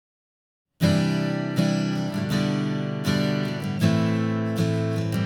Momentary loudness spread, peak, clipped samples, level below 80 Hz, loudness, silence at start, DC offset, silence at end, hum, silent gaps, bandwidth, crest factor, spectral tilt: 5 LU; -8 dBFS; under 0.1%; -58 dBFS; -24 LUFS; 0.8 s; under 0.1%; 0 s; none; none; 18.5 kHz; 16 dB; -6.5 dB/octave